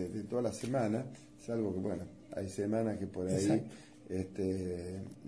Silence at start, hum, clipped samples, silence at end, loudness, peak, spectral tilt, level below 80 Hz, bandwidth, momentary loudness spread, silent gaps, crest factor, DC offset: 0 s; none; under 0.1%; 0 s; -37 LUFS; -18 dBFS; -7 dB/octave; -66 dBFS; 11 kHz; 11 LU; none; 18 dB; under 0.1%